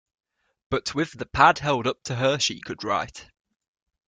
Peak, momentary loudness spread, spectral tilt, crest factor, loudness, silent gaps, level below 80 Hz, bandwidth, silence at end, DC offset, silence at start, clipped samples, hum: -2 dBFS; 11 LU; -4 dB/octave; 24 dB; -24 LUFS; none; -52 dBFS; 9.6 kHz; 0.85 s; under 0.1%; 0.7 s; under 0.1%; none